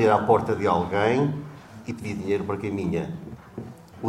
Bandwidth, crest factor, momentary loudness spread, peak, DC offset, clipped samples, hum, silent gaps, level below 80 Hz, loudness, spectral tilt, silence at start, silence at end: 12.5 kHz; 20 dB; 19 LU; -6 dBFS; under 0.1%; under 0.1%; none; none; -54 dBFS; -25 LUFS; -7.5 dB/octave; 0 s; 0 s